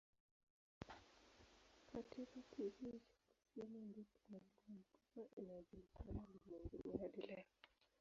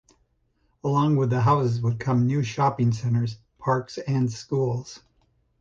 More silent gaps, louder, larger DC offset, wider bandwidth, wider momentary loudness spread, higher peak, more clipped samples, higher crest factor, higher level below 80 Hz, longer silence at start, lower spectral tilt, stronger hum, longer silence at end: first, 5.33-5.37 s vs none; second, -56 LUFS vs -24 LUFS; neither; about the same, 7.4 kHz vs 7.6 kHz; first, 13 LU vs 9 LU; second, -32 dBFS vs -8 dBFS; neither; first, 24 dB vs 16 dB; second, -68 dBFS vs -56 dBFS; about the same, 0.8 s vs 0.85 s; about the same, -6.5 dB/octave vs -7.5 dB/octave; neither; second, 0.15 s vs 0.65 s